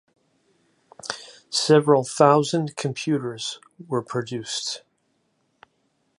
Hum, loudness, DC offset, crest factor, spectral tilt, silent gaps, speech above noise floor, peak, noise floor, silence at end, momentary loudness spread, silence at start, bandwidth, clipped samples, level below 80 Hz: none; -23 LUFS; under 0.1%; 22 dB; -4.5 dB/octave; none; 48 dB; -2 dBFS; -70 dBFS; 1.4 s; 17 LU; 1.05 s; 11.5 kHz; under 0.1%; -72 dBFS